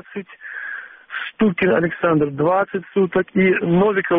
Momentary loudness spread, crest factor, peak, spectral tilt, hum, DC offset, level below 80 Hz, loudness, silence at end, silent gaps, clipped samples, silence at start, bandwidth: 15 LU; 12 dB; -6 dBFS; -6 dB/octave; none; under 0.1%; -54 dBFS; -19 LUFS; 0 s; none; under 0.1%; 0.1 s; 3.8 kHz